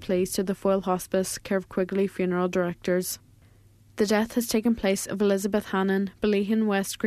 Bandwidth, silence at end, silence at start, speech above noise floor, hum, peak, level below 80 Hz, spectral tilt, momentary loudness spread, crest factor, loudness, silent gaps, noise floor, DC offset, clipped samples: 14 kHz; 0 s; 0 s; 30 dB; none; -10 dBFS; -54 dBFS; -5 dB/octave; 4 LU; 16 dB; -26 LUFS; none; -56 dBFS; under 0.1%; under 0.1%